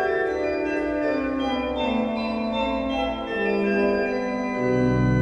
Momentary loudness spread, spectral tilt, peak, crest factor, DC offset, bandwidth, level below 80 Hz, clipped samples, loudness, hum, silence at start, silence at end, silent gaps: 4 LU; -7.5 dB/octave; -10 dBFS; 14 dB; under 0.1%; 9.4 kHz; -42 dBFS; under 0.1%; -24 LUFS; none; 0 s; 0 s; none